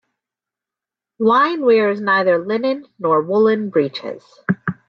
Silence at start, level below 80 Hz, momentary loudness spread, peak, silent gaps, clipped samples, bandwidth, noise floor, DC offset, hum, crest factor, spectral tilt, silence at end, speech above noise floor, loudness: 1.2 s; -68 dBFS; 9 LU; -4 dBFS; none; under 0.1%; 6.2 kHz; -87 dBFS; under 0.1%; none; 14 dB; -8 dB/octave; 0.15 s; 71 dB; -17 LUFS